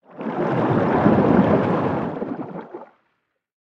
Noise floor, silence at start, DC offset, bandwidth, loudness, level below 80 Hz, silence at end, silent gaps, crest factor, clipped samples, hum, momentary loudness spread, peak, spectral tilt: -72 dBFS; 0.15 s; under 0.1%; 6.4 kHz; -20 LUFS; -52 dBFS; 0.95 s; none; 18 dB; under 0.1%; none; 18 LU; -2 dBFS; -9.5 dB/octave